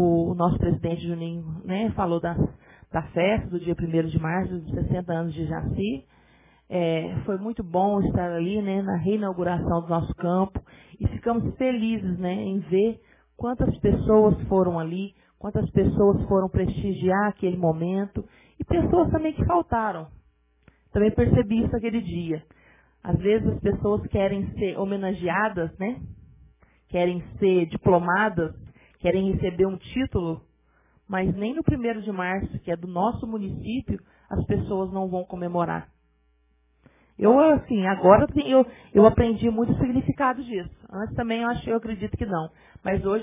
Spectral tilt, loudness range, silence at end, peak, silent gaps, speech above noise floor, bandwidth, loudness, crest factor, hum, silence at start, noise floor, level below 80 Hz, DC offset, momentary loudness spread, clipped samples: -11.5 dB/octave; 7 LU; 0 s; 0 dBFS; none; 41 dB; 3.8 kHz; -24 LUFS; 24 dB; none; 0 s; -65 dBFS; -40 dBFS; under 0.1%; 11 LU; under 0.1%